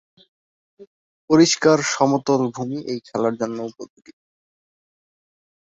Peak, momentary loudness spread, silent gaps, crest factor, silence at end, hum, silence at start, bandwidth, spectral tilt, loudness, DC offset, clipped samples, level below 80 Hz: -2 dBFS; 16 LU; 0.87-1.28 s; 20 dB; 1.75 s; none; 0.8 s; 8 kHz; -4.5 dB/octave; -19 LUFS; under 0.1%; under 0.1%; -64 dBFS